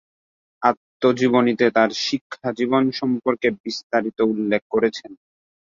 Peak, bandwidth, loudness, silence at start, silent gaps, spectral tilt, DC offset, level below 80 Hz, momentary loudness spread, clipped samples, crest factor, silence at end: -2 dBFS; 7.6 kHz; -21 LUFS; 0.6 s; 0.77-1.00 s, 2.21-2.30 s, 3.60-3.64 s, 3.84-3.90 s, 4.62-4.70 s; -5 dB/octave; under 0.1%; -64 dBFS; 7 LU; under 0.1%; 20 dB; 0.65 s